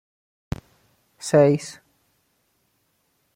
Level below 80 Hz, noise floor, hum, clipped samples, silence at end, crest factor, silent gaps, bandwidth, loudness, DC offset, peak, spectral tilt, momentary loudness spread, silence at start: -52 dBFS; -69 dBFS; none; under 0.1%; 1.65 s; 20 dB; none; 15.5 kHz; -20 LUFS; under 0.1%; -6 dBFS; -6.5 dB/octave; 18 LU; 1.25 s